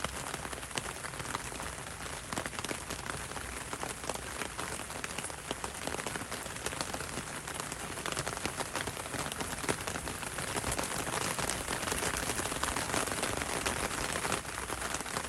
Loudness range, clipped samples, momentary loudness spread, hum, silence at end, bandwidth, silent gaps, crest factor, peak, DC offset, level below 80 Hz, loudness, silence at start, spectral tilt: 5 LU; under 0.1%; 6 LU; none; 0 s; 16 kHz; none; 26 dB; -12 dBFS; under 0.1%; -52 dBFS; -36 LUFS; 0 s; -2.5 dB/octave